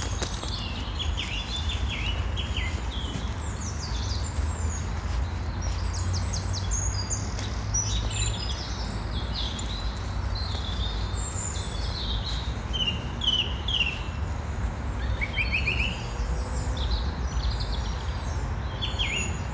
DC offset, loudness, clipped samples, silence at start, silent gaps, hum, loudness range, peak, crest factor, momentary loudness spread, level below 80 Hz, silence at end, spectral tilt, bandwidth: under 0.1%; -29 LUFS; under 0.1%; 0 s; none; none; 3 LU; -14 dBFS; 16 dB; 7 LU; -32 dBFS; 0 s; -3.5 dB/octave; 8 kHz